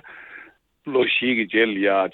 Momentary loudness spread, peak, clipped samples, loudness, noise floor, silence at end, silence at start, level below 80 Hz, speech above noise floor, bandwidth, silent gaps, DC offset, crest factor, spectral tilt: 21 LU; -4 dBFS; under 0.1%; -20 LUFS; -48 dBFS; 0.05 s; 0.05 s; -66 dBFS; 28 dB; 4.3 kHz; none; under 0.1%; 18 dB; -7.5 dB/octave